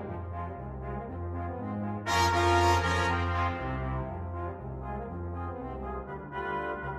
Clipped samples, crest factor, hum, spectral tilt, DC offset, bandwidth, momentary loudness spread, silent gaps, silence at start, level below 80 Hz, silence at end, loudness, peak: under 0.1%; 18 dB; none; -5.5 dB/octave; under 0.1%; 14.5 kHz; 14 LU; none; 0 s; -44 dBFS; 0 s; -31 LUFS; -12 dBFS